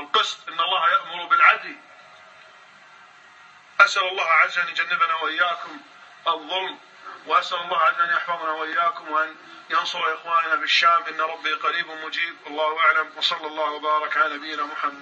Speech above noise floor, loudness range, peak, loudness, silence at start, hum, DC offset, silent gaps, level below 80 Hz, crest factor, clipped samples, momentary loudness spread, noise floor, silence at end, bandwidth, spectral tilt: 26 dB; 3 LU; 0 dBFS; -21 LUFS; 0 s; none; under 0.1%; none; -90 dBFS; 22 dB; under 0.1%; 11 LU; -49 dBFS; 0 s; 8.6 kHz; -0.5 dB/octave